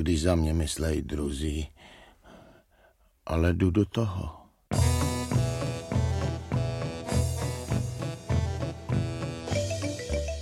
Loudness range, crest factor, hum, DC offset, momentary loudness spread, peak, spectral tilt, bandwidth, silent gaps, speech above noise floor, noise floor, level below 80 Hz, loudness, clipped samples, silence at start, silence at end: 3 LU; 20 dB; none; under 0.1%; 9 LU; -10 dBFS; -6 dB/octave; 15 kHz; none; 36 dB; -62 dBFS; -38 dBFS; -29 LUFS; under 0.1%; 0 s; 0 s